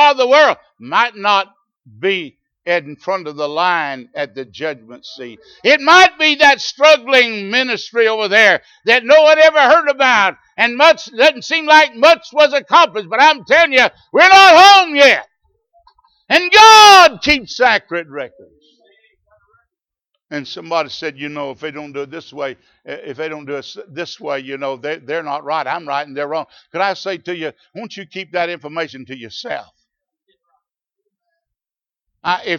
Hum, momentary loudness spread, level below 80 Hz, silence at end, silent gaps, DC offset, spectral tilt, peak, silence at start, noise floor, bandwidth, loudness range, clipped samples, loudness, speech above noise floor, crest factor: none; 21 LU; -54 dBFS; 0 s; none; under 0.1%; -1.5 dB/octave; 0 dBFS; 0 s; under -90 dBFS; 18.5 kHz; 18 LU; under 0.1%; -11 LUFS; over 77 dB; 14 dB